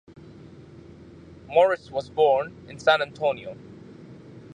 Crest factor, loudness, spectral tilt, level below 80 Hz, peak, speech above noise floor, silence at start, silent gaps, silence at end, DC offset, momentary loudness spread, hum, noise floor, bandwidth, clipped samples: 22 dB; -23 LUFS; -5 dB/octave; -60 dBFS; -6 dBFS; 23 dB; 1.5 s; none; 0.15 s; under 0.1%; 24 LU; none; -46 dBFS; 9.8 kHz; under 0.1%